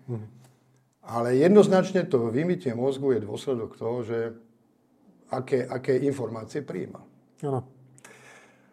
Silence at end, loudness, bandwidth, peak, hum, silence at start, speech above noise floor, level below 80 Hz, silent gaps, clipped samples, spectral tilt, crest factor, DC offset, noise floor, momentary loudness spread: 1.1 s; -26 LUFS; 11.5 kHz; -6 dBFS; none; 0.1 s; 39 dB; -72 dBFS; none; under 0.1%; -7 dB/octave; 22 dB; under 0.1%; -64 dBFS; 17 LU